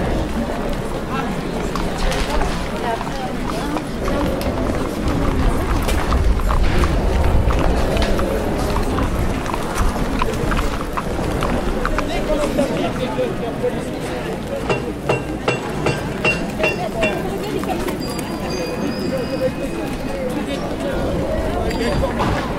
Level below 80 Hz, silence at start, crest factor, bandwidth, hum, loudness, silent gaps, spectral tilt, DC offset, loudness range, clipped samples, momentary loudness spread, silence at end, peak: -24 dBFS; 0 s; 16 dB; 16 kHz; none; -21 LUFS; none; -6 dB/octave; under 0.1%; 3 LU; under 0.1%; 5 LU; 0 s; -4 dBFS